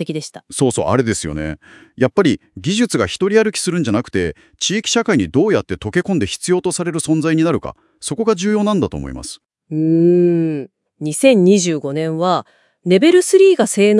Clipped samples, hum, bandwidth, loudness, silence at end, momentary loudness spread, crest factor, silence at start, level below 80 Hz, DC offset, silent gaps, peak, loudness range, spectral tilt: under 0.1%; none; 12 kHz; -16 LUFS; 0 s; 15 LU; 16 dB; 0 s; -46 dBFS; under 0.1%; none; 0 dBFS; 3 LU; -5 dB/octave